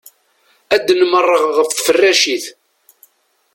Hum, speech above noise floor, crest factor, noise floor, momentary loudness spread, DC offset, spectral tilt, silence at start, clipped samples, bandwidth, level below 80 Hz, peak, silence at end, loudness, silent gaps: none; 45 dB; 16 dB; -58 dBFS; 6 LU; under 0.1%; -1 dB/octave; 0.7 s; under 0.1%; 17 kHz; -60 dBFS; 0 dBFS; 1.05 s; -13 LUFS; none